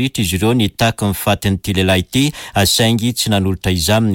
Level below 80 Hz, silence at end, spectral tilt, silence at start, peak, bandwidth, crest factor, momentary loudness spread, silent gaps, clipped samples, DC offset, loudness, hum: -36 dBFS; 0 s; -4.5 dB/octave; 0 s; -4 dBFS; 17 kHz; 12 dB; 4 LU; none; under 0.1%; under 0.1%; -15 LUFS; none